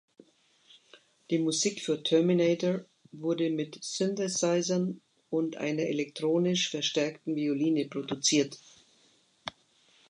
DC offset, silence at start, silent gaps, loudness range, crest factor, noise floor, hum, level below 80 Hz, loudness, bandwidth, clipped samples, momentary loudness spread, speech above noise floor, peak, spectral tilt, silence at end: under 0.1%; 1.3 s; none; 2 LU; 18 dB; -66 dBFS; none; -78 dBFS; -29 LUFS; 11 kHz; under 0.1%; 10 LU; 37 dB; -12 dBFS; -4 dB/octave; 0.6 s